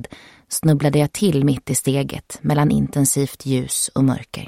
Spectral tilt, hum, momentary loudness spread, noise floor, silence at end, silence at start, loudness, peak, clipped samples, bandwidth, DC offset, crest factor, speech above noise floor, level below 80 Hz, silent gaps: -5.5 dB/octave; none; 6 LU; -40 dBFS; 0 s; 0 s; -19 LUFS; -4 dBFS; under 0.1%; 16 kHz; under 0.1%; 16 dB; 21 dB; -46 dBFS; none